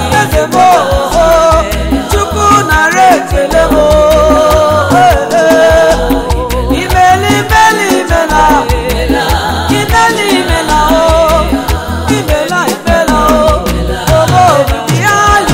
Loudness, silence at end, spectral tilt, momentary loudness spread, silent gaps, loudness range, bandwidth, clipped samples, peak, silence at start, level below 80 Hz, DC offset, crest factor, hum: -8 LUFS; 0 s; -4.5 dB/octave; 6 LU; none; 2 LU; 16.5 kHz; 0.5%; 0 dBFS; 0 s; -18 dBFS; under 0.1%; 8 dB; none